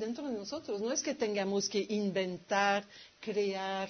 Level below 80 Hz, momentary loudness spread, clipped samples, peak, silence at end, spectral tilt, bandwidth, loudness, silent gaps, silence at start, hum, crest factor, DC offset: -76 dBFS; 8 LU; under 0.1%; -16 dBFS; 0 s; -3 dB/octave; 6.4 kHz; -34 LUFS; none; 0 s; none; 18 dB; under 0.1%